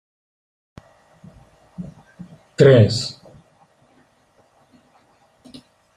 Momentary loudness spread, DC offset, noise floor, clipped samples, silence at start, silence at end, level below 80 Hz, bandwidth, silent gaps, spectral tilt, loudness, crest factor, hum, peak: 26 LU; under 0.1%; -59 dBFS; under 0.1%; 1.8 s; 2.85 s; -58 dBFS; 10.5 kHz; none; -6.5 dB/octave; -15 LUFS; 20 dB; none; -2 dBFS